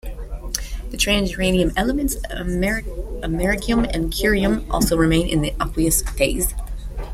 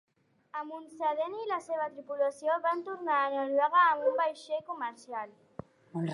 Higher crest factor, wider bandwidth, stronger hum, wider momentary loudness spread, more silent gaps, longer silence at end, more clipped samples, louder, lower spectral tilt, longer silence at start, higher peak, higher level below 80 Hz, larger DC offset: about the same, 20 dB vs 18 dB; first, 16.5 kHz vs 11.5 kHz; neither; second, 12 LU vs 17 LU; neither; about the same, 0 s vs 0 s; neither; first, -20 LUFS vs -31 LUFS; second, -4 dB/octave vs -6 dB/octave; second, 0.05 s vs 0.55 s; first, 0 dBFS vs -14 dBFS; first, -28 dBFS vs -78 dBFS; neither